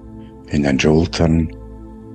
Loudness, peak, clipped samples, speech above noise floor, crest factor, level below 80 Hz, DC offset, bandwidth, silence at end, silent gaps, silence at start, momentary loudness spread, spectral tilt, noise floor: -17 LUFS; -2 dBFS; under 0.1%; 21 dB; 16 dB; -32 dBFS; under 0.1%; 9 kHz; 0 s; none; 0 s; 22 LU; -6.5 dB/octave; -36 dBFS